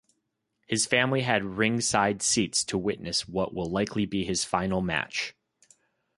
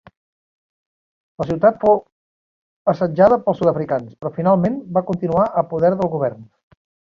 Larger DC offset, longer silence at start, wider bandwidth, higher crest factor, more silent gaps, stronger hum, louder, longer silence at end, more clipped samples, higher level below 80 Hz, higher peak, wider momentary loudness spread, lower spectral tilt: neither; second, 0.7 s vs 1.4 s; first, 11.5 kHz vs 7 kHz; about the same, 22 dB vs 18 dB; second, none vs 2.12-2.85 s; neither; second, -27 LUFS vs -18 LUFS; first, 0.85 s vs 0.65 s; neither; about the same, -54 dBFS vs -52 dBFS; second, -6 dBFS vs -2 dBFS; about the same, 7 LU vs 9 LU; second, -3.5 dB/octave vs -9.5 dB/octave